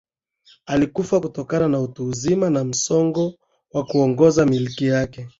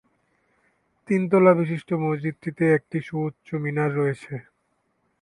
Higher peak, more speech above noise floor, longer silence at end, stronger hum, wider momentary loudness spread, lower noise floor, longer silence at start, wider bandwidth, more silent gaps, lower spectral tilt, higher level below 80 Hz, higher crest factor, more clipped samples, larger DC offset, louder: about the same, -2 dBFS vs -4 dBFS; second, 37 dB vs 49 dB; second, 0.1 s vs 0.8 s; neither; second, 9 LU vs 13 LU; second, -56 dBFS vs -71 dBFS; second, 0.7 s vs 1.1 s; second, 8 kHz vs 11 kHz; neither; second, -6 dB/octave vs -9 dB/octave; first, -52 dBFS vs -66 dBFS; about the same, 18 dB vs 20 dB; neither; neither; first, -20 LUFS vs -23 LUFS